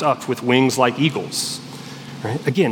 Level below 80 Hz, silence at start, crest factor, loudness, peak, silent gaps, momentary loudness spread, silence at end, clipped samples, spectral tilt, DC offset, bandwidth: -68 dBFS; 0 s; 18 dB; -20 LUFS; -2 dBFS; none; 16 LU; 0 s; under 0.1%; -4.5 dB/octave; under 0.1%; 18 kHz